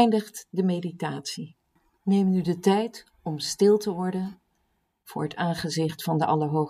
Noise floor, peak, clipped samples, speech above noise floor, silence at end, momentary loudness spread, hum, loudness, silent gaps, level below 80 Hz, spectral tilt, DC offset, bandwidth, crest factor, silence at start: -73 dBFS; -6 dBFS; under 0.1%; 48 dB; 0 s; 13 LU; none; -26 LUFS; none; -66 dBFS; -6 dB/octave; under 0.1%; 15.5 kHz; 20 dB; 0 s